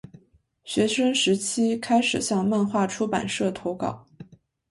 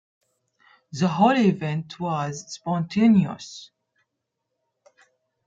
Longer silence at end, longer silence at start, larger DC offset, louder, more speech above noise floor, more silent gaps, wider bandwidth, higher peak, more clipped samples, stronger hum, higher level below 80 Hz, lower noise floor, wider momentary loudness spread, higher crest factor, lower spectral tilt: second, 0.45 s vs 1.8 s; second, 0.65 s vs 0.95 s; neither; about the same, -24 LUFS vs -23 LUFS; second, 37 dB vs 58 dB; neither; first, 11.5 kHz vs 7.8 kHz; about the same, -8 dBFS vs -6 dBFS; neither; neither; first, -60 dBFS vs -66 dBFS; second, -60 dBFS vs -81 dBFS; second, 8 LU vs 19 LU; about the same, 16 dB vs 20 dB; second, -4 dB/octave vs -6.5 dB/octave